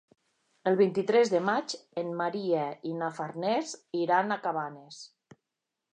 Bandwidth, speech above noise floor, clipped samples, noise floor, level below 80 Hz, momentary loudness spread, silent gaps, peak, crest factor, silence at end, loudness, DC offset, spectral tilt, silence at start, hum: 9.8 kHz; 58 dB; under 0.1%; -87 dBFS; -84 dBFS; 13 LU; none; -12 dBFS; 18 dB; 0.85 s; -29 LUFS; under 0.1%; -5 dB/octave; 0.65 s; none